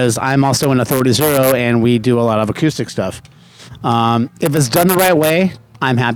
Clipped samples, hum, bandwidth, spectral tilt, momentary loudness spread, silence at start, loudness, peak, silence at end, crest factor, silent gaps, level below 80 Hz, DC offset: under 0.1%; none; over 20 kHz; -5 dB/octave; 9 LU; 0 s; -14 LUFS; 0 dBFS; 0 s; 14 dB; none; -48 dBFS; under 0.1%